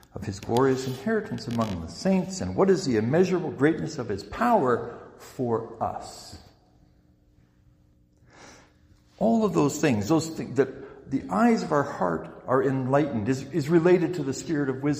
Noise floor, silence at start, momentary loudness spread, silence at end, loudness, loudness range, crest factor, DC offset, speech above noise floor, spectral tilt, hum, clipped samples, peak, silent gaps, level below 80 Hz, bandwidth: -61 dBFS; 0.15 s; 11 LU; 0 s; -25 LUFS; 11 LU; 18 dB; under 0.1%; 36 dB; -6.5 dB/octave; none; under 0.1%; -8 dBFS; none; -56 dBFS; 15.5 kHz